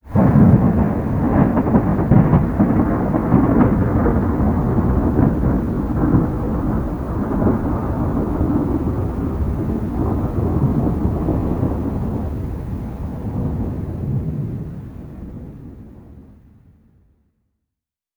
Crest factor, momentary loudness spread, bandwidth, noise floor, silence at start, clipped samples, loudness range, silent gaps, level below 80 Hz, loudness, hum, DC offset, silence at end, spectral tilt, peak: 18 dB; 12 LU; over 20 kHz; -84 dBFS; 0.05 s; under 0.1%; 11 LU; none; -28 dBFS; -18 LUFS; none; under 0.1%; 1.85 s; -11 dB/octave; 0 dBFS